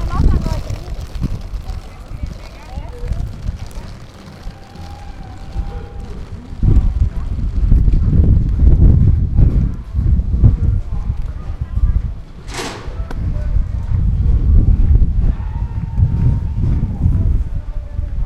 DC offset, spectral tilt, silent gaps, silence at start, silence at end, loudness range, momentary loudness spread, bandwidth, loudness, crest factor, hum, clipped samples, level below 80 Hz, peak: under 0.1%; -8 dB/octave; none; 0 s; 0 s; 15 LU; 18 LU; 8.8 kHz; -18 LUFS; 14 dB; none; under 0.1%; -16 dBFS; 0 dBFS